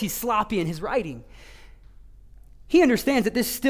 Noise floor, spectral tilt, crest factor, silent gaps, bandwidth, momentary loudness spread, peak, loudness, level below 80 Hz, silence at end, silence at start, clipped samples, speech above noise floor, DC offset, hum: -47 dBFS; -4.5 dB/octave; 18 dB; none; 16 kHz; 9 LU; -8 dBFS; -23 LUFS; -48 dBFS; 0 s; 0 s; under 0.1%; 24 dB; under 0.1%; none